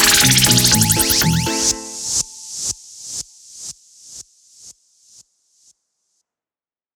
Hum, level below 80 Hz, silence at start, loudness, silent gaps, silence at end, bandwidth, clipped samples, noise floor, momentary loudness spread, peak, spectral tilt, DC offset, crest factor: none; -40 dBFS; 0 s; -14 LUFS; none; 2.25 s; over 20 kHz; under 0.1%; under -90 dBFS; 24 LU; 0 dBFS; -2 dB/octave; under 0.1%; 20 dB